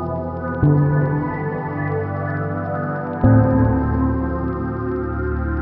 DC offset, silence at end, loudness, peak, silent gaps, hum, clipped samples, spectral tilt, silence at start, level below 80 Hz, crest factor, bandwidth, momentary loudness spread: under 0.1%; 0 s; -20 LUFS; -2 dBFS; none; none; under 0.1%; -10.5 dB/octave; 0 s; -32 dBFS; 16 dB; 3.1 kHz; 9 LU